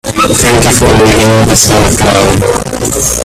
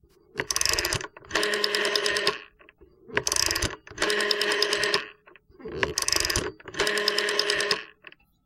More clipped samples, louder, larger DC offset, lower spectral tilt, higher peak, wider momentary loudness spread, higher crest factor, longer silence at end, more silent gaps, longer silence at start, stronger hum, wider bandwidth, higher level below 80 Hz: first, 0.5% vs under 0.1%; first, -7 LUFS vs -25 LUFS; neither; first, -4 dB/octave vs -1 dB/octave; first, 0 dBFS vs -4 dBFS; second, 5 LU vs 11 LU; second, 8 dB vs 24 dB; second, 0 s vs 0.6 s; neither; second, 0.05 s vs 0.35 s; neither; first, over 20 kHz vs 17 kHz; first, -22 dBFS vs -48 dBFS